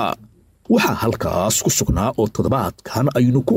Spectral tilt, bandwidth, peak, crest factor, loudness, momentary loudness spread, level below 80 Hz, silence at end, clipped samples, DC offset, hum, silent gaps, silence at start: -5 dB/octave; 16.5 kHz; -6 dBFS; 12 dB; -19 LUFS; 6 LU; -36 dBFS; 0 s; under 0.1%; under 0.1%; none; none; 0 s